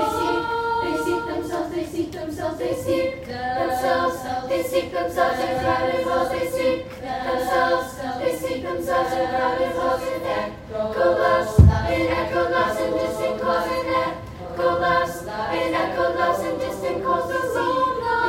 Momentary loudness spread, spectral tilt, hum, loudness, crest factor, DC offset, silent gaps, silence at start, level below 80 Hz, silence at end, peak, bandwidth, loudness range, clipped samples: 7 LU; -6 dB/octave; none; -23 LUFS; 22 dB; under 0.1%; none; 0 s; -36 dBFS; 0 s; 0 dBFS; 16.5 kHz; 4 LU; under 0.1%